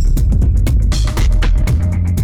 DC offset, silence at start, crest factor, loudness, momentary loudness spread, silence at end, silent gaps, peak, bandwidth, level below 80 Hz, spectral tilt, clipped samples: under 0.1%; 0 s; 6 dB; -15 LUFS; 2 LU; 0 s; none; -6 dBFS; 14.5 kHz; -12 dBFS; -6 dB/octave; under 0.1%